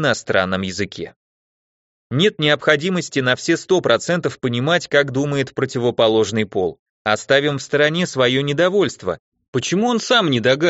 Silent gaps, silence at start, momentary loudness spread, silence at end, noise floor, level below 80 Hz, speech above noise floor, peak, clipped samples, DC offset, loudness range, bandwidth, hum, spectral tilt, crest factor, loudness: 1.16-2.10 s, 6.79-7.05 s, 9.19-9.32 s, 9.48-9.53 s; 0 s; 10 LU; 0 s; under -90 dBFS; -58 dBFS; over 72 dB; 0 dBFS; under 0.1%; under 0.1%; 2 LU; 8 kHz; none; -3.5 dB/octave; 18 dB; -18 LUFS